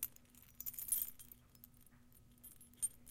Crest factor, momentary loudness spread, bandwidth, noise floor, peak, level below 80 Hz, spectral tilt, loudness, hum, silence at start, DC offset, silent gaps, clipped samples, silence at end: 28 dB; 24 LU; 17 kHz; -65 dBFS; -20 dBFS; -70 dBFS; -0.5 dB/octave; -42 LUFS; none; 0 s; under 0.1%; none; under 0.1%; 0 s